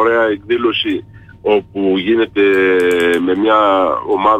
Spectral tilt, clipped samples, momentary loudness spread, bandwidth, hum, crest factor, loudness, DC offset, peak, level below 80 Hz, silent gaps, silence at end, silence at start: -5.5 dB/octave; under 0.1%; 6 LU; 15 kHz; none; 10 dB; -14 LUFS; under 0.1%; -2 dBFS; -50 dBFS; none; 0 s; 0 s